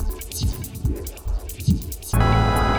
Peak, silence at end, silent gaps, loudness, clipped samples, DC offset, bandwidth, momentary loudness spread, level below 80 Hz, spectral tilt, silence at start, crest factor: -6 dBFS; 0 s; none; -24 LUFS; under 0.1%; under 0.1%; over 20 kHz; 12 LU; -26 dBFS; -5.5 dB/octave; 0 s; 16 dB